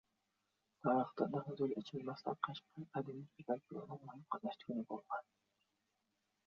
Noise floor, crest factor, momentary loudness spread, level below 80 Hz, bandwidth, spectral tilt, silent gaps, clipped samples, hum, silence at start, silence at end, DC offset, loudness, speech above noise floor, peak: -86 dBFS; 22 dB; 13 LU; -86 dBFS; 7 kHz; -6 dB/octave; none; under 0.1%; none; 0.85 s; 1.25 s; under 0.1%; -43 LUFS; 43 dB; -22 dBFS